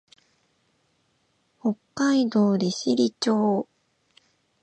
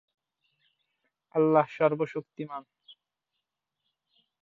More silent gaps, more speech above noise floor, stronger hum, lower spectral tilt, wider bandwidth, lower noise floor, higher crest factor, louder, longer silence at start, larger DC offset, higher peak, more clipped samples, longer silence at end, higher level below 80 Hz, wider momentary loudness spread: neither; second, 47 dB vs 58 dB; neither; second, -5.5 dB/octave vs -9 dB/octave; first, 9 kHz vs 7 kHz; second, -69 dBFS vs -85 dBFS; second, 16 dB vs 22 dB; first, -24 LUFS vs -27 LUFS; first, 1.65 s vs 1.35 s; neither; about the same, -10 dBFS vs -10 dBFS; neither; second, 1 s vs 1.8 s; first, -74 dBFS vs -80 dBFS; second, 8 LU vs 16 LU